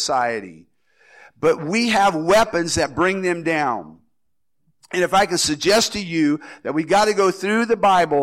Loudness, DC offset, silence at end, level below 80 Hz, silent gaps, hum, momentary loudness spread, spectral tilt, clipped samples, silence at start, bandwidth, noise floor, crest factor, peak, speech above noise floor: -19 LUFS; under 0.1%; 0 s; -50 dBFS; none; none; 8 LU; -3.5 dB/octave; under 0.1%; 0 s; 16.5 kHz; -80 dBFS; 12 dB; -8 dBFS; 61 dB